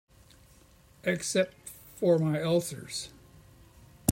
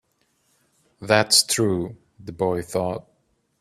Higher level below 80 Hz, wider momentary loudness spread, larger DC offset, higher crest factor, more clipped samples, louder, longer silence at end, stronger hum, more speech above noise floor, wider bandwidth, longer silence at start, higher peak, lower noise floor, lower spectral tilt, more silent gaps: about the same, -62 dBFS vs -58 dBFS; second, 16 LU vs 23 LU; neither; about the same, 26 dB vs 24 dB; neither; second, -30 LUFS vs -21 LUFS; second, 0 s vs 0.6 s; neither; second, 30 dB vs 46 dB; about the same, 16 kHz vs 15.5 kHz; about the same, 1.05 s vs 1 s; second, -6 dBFS vs 0 dBFS; second, -58 dBFS vs -68 dBFS; first, -5 dB/octave vs -3 dB/octave; neither